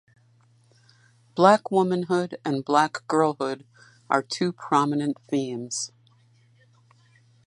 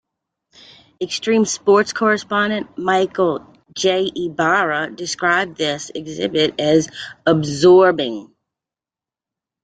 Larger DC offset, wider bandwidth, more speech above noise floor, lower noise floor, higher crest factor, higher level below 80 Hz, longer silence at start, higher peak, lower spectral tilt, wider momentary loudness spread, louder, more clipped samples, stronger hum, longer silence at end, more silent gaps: neither; first, 11.5 kHz vs 9.2 kHz; second, 36 dB vs 73 dB; second, -60 dBFS vs -90 dBFS; first, 24 dB vs 16 dB; second, -76 dBFS vs -58 dBFS; first, 1.35 s vs 1 s; about the same, -2 dBFS vs -2 dBFS; about the same, -5 dB/octave vs -4 dB/octave; about the same, 12 LU vs 11 LU; second, -24 LUFS vs -17 LUFS; neither; neither; first, 1.6 s vs 1.4 s; neither